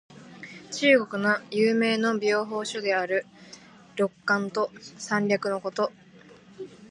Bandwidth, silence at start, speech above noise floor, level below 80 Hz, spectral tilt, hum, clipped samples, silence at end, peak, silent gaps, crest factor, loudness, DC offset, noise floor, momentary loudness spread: 11.5 kHz; 0.1 s; 26 dB; -74 dBFS; -4.5 dB/octave; none; under 0.1%; 0.05 s; -8 dBFS; none; 20 dB; -25 LUFS; under 0.1%; -51 dBFS; 21 LU